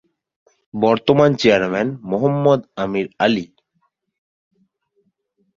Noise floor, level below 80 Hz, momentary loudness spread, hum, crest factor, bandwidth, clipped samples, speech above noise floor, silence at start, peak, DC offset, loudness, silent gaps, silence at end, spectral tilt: -68 dBFS; -56 dBFS; 10 LU; none; 18 dB; 7.4 kHz; under 0.1%; 52 dB; 0.75 s; -2 dBFS; under 0.1%; -17 LUFS; none; 2.1 s; -6.5 dB/octave